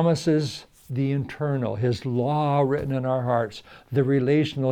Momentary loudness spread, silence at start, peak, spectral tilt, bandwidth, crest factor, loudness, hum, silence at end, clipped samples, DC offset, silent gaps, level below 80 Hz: 10 LU; 0 s; -8 dBFS; -7.5 dB/octave; 10 kHz; 14 dB; -24 LUFS; none; 0 s; under 0.1%; under 0.1%; none; -56 dBFS